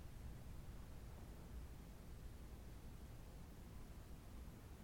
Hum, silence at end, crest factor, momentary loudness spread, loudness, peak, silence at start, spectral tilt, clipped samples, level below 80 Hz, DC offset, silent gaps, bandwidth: none; 0 s; 12 dB; 2 LU; -58 LUFS; -42 dBFS; 0 s; -6 dB/octave; under 0.1%; -58 dBFS; under 0.1%; none; 19 kHz